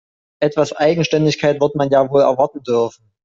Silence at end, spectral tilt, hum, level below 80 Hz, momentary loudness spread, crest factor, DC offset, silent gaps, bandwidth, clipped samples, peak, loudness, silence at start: 0.35 s; -6 dB/octave; none; -56 dBFS; 5 LU; 14 dB; under 0.1%; none; 7.6 kHz; under 0.1%; -2 dBFS; -16 LUFS; 0.4 s